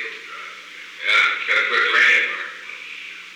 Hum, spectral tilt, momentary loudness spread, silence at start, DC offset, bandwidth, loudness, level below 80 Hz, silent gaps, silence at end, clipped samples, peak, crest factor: 60 Hz at -70 dBFS; 1 dB/octave; 20 LU; 0 s; under 0.1%; 16.5 kHz; -16 LUFS; -80 dBFS; none; 0 s; under 0.1%; -6 dBFS; 16 dB